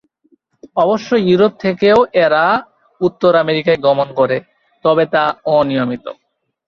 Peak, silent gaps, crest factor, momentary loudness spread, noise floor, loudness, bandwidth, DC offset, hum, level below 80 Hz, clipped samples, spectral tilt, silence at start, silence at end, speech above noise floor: -2 dBFS; none; 14 dB; 8 LU; -57 dBFS; -14 LUFS; 7 kHz; under 0.1%; none; -54 dBFS; under 0.1%; -7 dB/octave; 0.75 s; 0.55 s; 44 dB